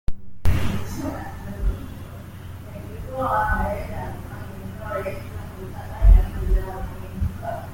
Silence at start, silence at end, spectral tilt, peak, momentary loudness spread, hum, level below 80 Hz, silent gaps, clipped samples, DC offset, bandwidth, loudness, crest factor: 0.1 s; 0 s; -7 dB/octave; -4 dBFS; 16 LU; none; -26 dBFS; none; under 0.1%; under 0.1%; 16.5 kHz; -27 LUFS; 20 dB